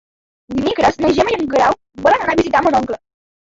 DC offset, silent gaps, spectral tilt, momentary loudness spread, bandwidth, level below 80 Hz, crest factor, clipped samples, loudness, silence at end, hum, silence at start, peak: under 0.1%; none; -5 dB/octave; 8 LU; 8 kHz; -42 dBFS; 14 dB; under 0.1%; -16 LUFS; 0.45 s; none; 0.5 s; -2 dBFS